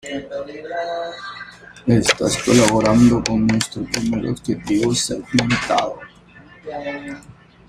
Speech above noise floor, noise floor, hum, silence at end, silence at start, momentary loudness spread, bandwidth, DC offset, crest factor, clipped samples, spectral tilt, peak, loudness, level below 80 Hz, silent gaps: 26 dB; -45 dBFS; none; 0.35 s; 0.05 s; 19 LU; 14.5 kHz; under 0.1%; 20 dB; under 0.1%; -4.5 dB/octave; 0 dBFS; -19 LUFS; -44 dBFS; none